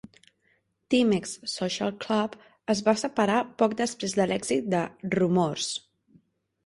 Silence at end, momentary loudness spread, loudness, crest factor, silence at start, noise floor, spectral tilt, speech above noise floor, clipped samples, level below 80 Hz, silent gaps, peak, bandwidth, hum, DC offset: 0.85 s; 7 LU; -27 LUFS; 20 dB; 0.9 s; -70 dBFS; -4.5 dB/octave; 44 dB; under 0.1%; -64 dBFS; none; -8 dBFS; 11.5 kHz; none; under 0.1%